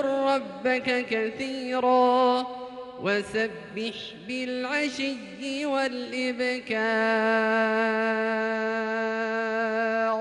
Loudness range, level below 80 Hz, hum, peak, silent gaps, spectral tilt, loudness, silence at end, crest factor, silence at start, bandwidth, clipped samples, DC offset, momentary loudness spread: 4 LU; -68 dBFS; none; -12 dBFS; none; -4.5 dB/octave; -26 LUFS; 0 s; 14 dB; 0 s; 11.5 kHz; under 0.1%; under 0.1%; 10 LU